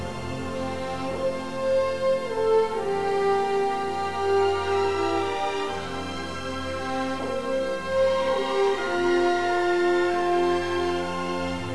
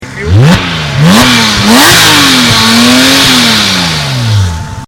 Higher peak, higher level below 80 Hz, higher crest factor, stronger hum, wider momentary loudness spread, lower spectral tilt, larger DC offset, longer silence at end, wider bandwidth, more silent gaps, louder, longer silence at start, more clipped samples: second, -10 dBFS vs 0 dBFS; second, -52 dBFS vs -26 dBFS; first, 14 dB vs 6 dB; neither; about the same, 8 LU vs 8 LU; first, -5 dB/octave vs -3.5 dB/octave; first, 0.9% vs under 0.1%; about the same, 0 s vs 0 s; second, 11 kHz vs over 20 kHz; neither; second, -25 LUFS vs -4 LUFS; about the same, 0 s vs 0 s; second, under 0.1% vs 4%